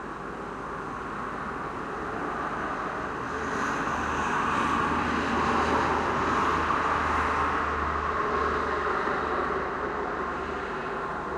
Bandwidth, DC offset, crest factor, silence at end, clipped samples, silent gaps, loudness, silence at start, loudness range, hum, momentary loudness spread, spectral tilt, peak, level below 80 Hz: 13.5 kHz; under 0.1%; 16 dB; 0 s; under 0.1%; none; -28 LUFS; 0 s; 6 LU; none; 9 LU; -5 dB/octave; -14 dBFS; -44 dBFS